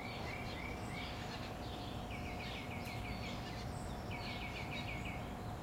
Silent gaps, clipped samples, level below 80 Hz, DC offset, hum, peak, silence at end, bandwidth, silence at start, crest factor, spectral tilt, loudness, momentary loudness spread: none; under 0.1%; -52 dBFS; under 0.1%; none; -30 dBFS; 0 s; 16 kHz; 0 s; 14 dB; -5 dB/octave; -44 LUFS; 2 LU